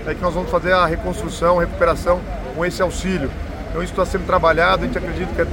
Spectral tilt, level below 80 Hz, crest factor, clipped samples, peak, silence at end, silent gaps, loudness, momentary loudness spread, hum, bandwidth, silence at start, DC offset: -5.5 dB/octave; -30 dBFS; 16 dB; under 0.1%; -2 dBFS; 0 s; none; -19 LUFS; 9 LU; none; 17 kHz; 0 s; under 0.1%